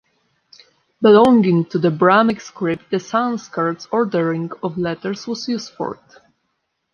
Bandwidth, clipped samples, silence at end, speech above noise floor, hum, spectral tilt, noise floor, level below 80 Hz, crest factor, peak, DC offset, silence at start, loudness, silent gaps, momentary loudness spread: 10.5 kHz; under 0.1%; 1 s; 55 dB; none; -6.5 dB/octave; -72 dBFS; -60 dBFS; 18 dB; -2 dBFS; under 0.1%; 1 s; -18 LUFS; none; 13 LU